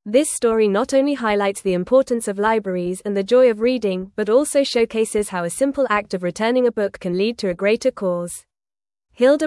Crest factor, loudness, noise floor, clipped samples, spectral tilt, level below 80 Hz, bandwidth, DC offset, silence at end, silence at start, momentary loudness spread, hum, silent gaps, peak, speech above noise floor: 14 dB; -19 LUFS; under -90 dBFS; under 0.1%; -4.5 dB/octave; -54 dBFS; 12 kHz; under 0.1%; 0 s; 0.05 s; 7 LU; none; none; -4 dBFS; over 71 dB